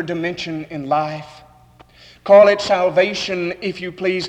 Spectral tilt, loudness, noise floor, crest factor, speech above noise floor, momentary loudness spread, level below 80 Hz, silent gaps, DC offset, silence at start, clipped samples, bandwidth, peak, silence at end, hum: -5 dB/octave; -17 LUFS; -48 dBFS; 16 dB; 31 dB; 16 LU; -56 dBFS; none; under 0.1%; 0 s; under 0.1%; 8.8 kHz; -2 dBFS; 0 s; 60 Hz at -55 dBFS